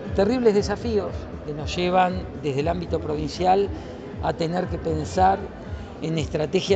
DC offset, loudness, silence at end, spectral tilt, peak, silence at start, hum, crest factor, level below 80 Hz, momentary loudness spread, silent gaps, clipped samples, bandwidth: under 0.1%; -24 LUFS; 0 s; -6 dB/octave; -6 dBFS; 0 s; none; 18 dB; -40 dBFS; 12 LU; none; under 0.1%; 8.8 kHz